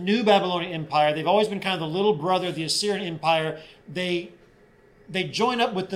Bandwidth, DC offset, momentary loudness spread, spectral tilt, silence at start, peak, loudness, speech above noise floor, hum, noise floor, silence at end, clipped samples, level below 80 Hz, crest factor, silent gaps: 15.5 kHz; under 0.1%; 10 LU; -4.5 dB/octave; 0 s; -6 dBFS; -24 LUFS; 31 dB; none; -55 dBFS; 0 s; under 0.1%; -64 dBFS; 18 dB; none